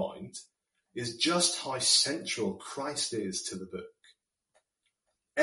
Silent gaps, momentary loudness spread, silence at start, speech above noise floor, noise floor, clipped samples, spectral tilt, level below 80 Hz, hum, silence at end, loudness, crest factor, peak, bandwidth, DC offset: none; 20 LU; 0 s; 49 dB; -80 dBFS; under 0.1%; -2 dB/octave; -72 dBFS; none; 0 s; -29 LUFS; 22 dB; -10 dBFS; 11.5 kHz; under 0.1%